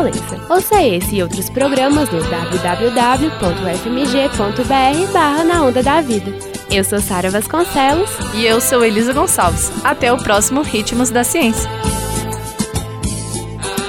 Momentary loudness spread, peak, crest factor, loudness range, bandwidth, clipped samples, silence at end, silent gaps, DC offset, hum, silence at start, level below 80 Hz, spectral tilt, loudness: 8 LU; 0 dBFS; 14 dB; 2 LU; 17 kHz; under 0.1%; 0 s; none; under 0.1%; none; 0 s; -32 dBFS; -4 dB/octave; -15 LUFS